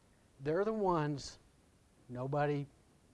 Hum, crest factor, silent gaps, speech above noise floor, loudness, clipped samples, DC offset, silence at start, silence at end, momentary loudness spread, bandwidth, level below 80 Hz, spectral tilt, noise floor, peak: none; 18 dB; none; 32 dB; -36 LUFS; under 0.1%; under 0.1%; 0.4 s; 0.45 s; 16 LU; 11 kHz; -64 dBFS; -7 dB/octave; -67 dBFS; -20 dBFS